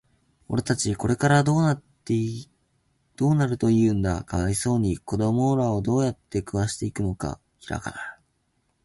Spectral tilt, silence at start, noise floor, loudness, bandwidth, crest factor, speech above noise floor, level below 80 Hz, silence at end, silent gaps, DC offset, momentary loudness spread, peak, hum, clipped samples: -6 dB/octave; 0.5 s; -71 dBFS; -24 LUFS; 12 kHz; 20 dB; 48 dB; -44 dBFS; 0.7 s; none; under 0.1%; 12 LU; -4 dBFS; none; under 0.1%